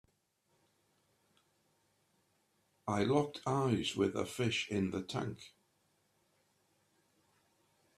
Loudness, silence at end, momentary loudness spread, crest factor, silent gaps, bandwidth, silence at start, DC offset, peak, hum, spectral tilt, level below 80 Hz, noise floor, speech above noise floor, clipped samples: -35 LUFS; 2.5 s; 9 LU; 22 dB; none; 14 kHz; 2.85 s; under 0.1%; -18 dBFS; none; -5.5 dB/octave; -72 dBFS; -78 dBFS; 43 dB; under 0.1%